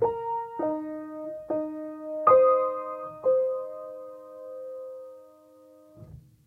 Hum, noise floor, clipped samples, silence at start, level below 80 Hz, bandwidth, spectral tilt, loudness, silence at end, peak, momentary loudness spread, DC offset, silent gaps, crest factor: none; -54 dBFS; under 0.1%; 0 s; -66 dBFS; 3 kHz; -9 dB/octave; -27 LUFS; 0.25 s; -6 dBFS; 22 LU; under 0.1%; none; 22 dB